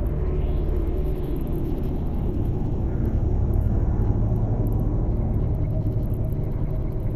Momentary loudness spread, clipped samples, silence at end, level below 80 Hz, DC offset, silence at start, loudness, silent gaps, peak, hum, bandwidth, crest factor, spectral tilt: 4 LU; under 0.1%; 0 s; -26 dBFS; under 0.1%; 0 s; -26 LUFS; none; -8 dBFS; none; 13 kHz; 14 dB; -11 dB/octave